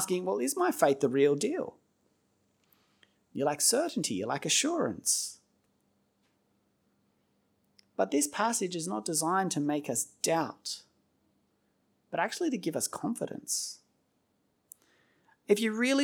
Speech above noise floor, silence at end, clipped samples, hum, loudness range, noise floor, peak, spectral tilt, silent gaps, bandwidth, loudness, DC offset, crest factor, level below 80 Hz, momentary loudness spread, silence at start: 45 dB; 0 s; under 0.1%; none; 6 LU; -75 dBFS; -10 dBFS; -3 dB/octave; none; over 20 kHz; -30 LUFS; under 0.1%; 24 dB; -82 dBFS; 11 LU; 0 s